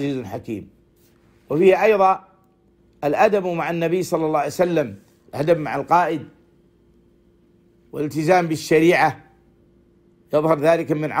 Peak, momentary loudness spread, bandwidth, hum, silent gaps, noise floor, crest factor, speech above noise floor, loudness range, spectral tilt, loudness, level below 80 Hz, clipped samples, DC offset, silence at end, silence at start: -4 dBFS; 14 LU; 16 kHz; none; none; -57 dBFS; 18 dB; 39 dB; 4 LU; -6 dB/octave; -19 LUFS; -58 dBFS; under 0.1%; under 0.1%; 0 s; 0 s